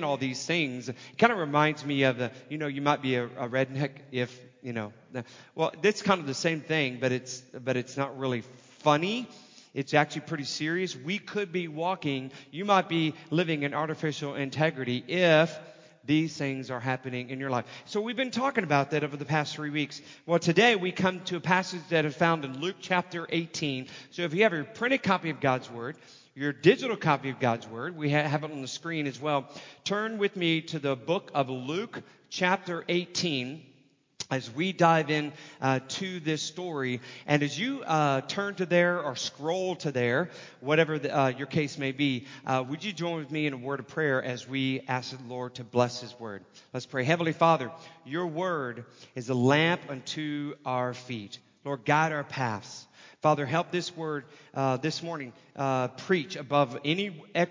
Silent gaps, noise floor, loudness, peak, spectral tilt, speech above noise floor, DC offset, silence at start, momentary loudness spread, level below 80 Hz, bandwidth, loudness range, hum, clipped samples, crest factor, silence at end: none; -63 dBFS; -29 LUFS; -4 dBFS; -5 dB/octave; 34 dB; under 0.1%; 0 s; 13 LU; -74 dBFS; 7.6 kHz; 4 LU; none; under 0.1%; 24 dB; 0 s